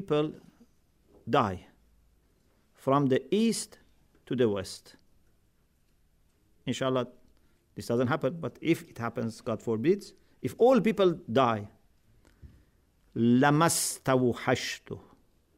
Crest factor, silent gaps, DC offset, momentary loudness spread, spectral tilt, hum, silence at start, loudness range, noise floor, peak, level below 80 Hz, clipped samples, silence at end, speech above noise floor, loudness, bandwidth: 20 dB; none; under 0.1%; 18 LU; -5 dB/octave; none; 0 s; 7 LU; -68 dBFS; -10 dBFS; -64 dBFS; under 0.1%; 0.6 s; 40 dB; -28 LUFS; 16 kHz